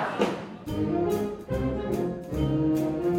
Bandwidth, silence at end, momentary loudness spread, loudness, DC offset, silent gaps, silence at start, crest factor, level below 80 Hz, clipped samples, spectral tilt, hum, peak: 16.5 kHz; 0 s; 6 LU; -28 LUFS; under 0.1%; none; 0 s; 18 dB; -42 dBFS; under 0.1%; -7.5 dB/octave; none; -10 dBFS